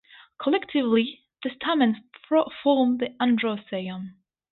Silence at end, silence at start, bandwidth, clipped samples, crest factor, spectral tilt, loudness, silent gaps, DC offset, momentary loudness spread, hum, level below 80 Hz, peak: 0.4 s; 0.4 s; 4.3 kHz; under 0.1%; 16 dB; -10 dB/octave; -25 LUFS; none; under 0.1%; 12 LU; none; -68 dBFS; -8 dBFS